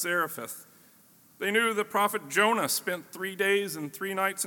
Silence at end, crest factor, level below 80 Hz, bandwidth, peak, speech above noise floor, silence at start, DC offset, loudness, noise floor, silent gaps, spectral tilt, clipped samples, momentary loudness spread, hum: 0 s; 20 dB; -84 dBFS; 17.5 kHz; -10 dBFS; 30 dB; 0 s; under 0.1%; -28 LUFS; -59 dBFS; none; -2.5 dB/octave; under 0.1%; 11 LU; none